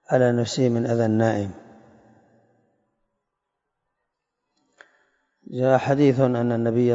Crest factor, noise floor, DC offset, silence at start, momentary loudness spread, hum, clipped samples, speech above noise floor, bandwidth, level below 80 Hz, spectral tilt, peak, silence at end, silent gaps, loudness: 20 dB; -81 dBFS; under 0.1%; 0.1 s; 7 LU; none; under 0.1%; 60 dB; 7.8 kHz; -66 dBFS; -7 dB/octave; -4 dBFS; 0 s; none; -21 LUFS